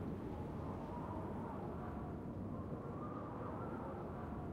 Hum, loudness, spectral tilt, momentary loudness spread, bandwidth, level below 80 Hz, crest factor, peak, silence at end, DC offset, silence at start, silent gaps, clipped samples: none; -46 LUFS; -9.5 dB/octave; 1 LU; 15.5 kHz; -58 dBFS; 12 dB; -34 dBFS; 0 s; under 0.1%; 0 s; none; under 0.1%